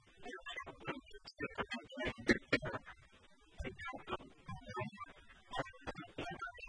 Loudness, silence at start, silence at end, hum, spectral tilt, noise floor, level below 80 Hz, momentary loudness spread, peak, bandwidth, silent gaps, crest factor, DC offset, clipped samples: -43 LUFS; 0.05 s; 0 s; none; -5 dB/octave; -65 dBFS; -60 dBFS; 17 LU; -16 dBFS; 10.5 kHz; none; 28 dB; under 0.1%; under 0.1%